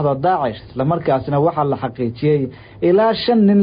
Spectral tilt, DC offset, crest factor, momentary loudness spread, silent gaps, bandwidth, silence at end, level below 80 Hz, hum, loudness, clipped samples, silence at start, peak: -12.5 dB/octave; under 0.1%; 10 dB; 8 LU; none; 5.2 kHz; 0 s; -48 dBFS; none; -18 LUFS; under 0.1%; 0 s; -6 dBFS